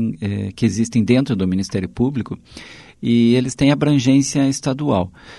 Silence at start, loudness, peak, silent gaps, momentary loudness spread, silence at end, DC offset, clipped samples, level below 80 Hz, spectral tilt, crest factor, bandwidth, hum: 0 s; -18 LUFS; -2 dBFS; none; 12 LU; 0 s; under 0.1%; under 0.1%; -46 dBFS; -6 dB/octave; 16 dB; 11.5 kHz; none